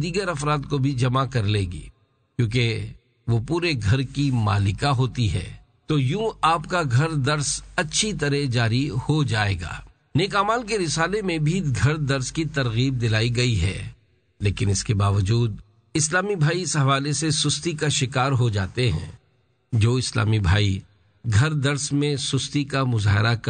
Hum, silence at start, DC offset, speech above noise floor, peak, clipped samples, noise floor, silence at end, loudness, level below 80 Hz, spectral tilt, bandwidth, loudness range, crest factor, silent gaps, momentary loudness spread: none; 0 s; under 0.1%; 42 dB; -6 dBFS; under 0.1%; -64 dBFS; 0 s; -23 LUFS; -42 dBFS; -5 dB/octave; 9.4 kHz; 2 LU; 18 dB; none; 7 LU